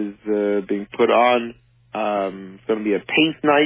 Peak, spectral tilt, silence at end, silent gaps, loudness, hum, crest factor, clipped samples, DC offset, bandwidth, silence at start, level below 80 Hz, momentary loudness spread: -4 dBFS; -9 dB/octave; 0 s; none; -20 LUFS; none; 16 dB; under 0.1%; under 0.1%; 4 kHz; 0 s; -62 dBFS; 12 LU